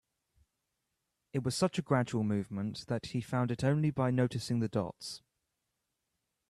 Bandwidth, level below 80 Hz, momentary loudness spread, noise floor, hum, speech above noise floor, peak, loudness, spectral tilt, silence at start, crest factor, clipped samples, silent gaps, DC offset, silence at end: 13 kHz; -66 dBFS; 9 LU; -85 dBFS; none; 52 dB; -16 dBFS; -33 LUFS; -6.5 dB/octave; 1.35 s; 18 dB; under 0.1%; none; under 0.1%; 1.35 s